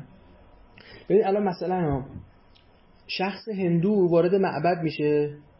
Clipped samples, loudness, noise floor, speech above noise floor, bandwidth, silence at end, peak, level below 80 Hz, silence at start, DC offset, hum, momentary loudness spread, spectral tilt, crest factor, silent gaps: under 0.1%; -24 LUFS; -56 dBFS; 32 dB; 5.8 kHz; 0.2 s; -10 dBFS; -54 dBFS; 0 s; under 0.1%; none; 9 LU; -11 dB/octave; 16 dB; none